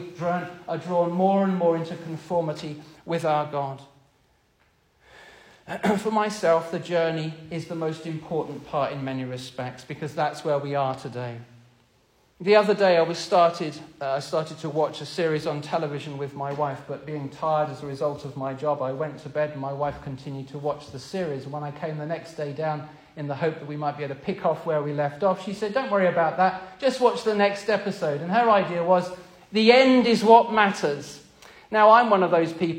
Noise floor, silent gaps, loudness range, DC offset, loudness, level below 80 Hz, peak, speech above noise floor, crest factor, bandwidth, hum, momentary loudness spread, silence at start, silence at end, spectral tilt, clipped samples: -64 dBFS; none; 11 LU; under 0.1%; -24 LUFS; -64 dBFS; -2 dBFS; 40 dB; 24 dB; 15.5 kHz; none; 15 LU; 0 s; 0 s; -6 dB/octave; under 0.1%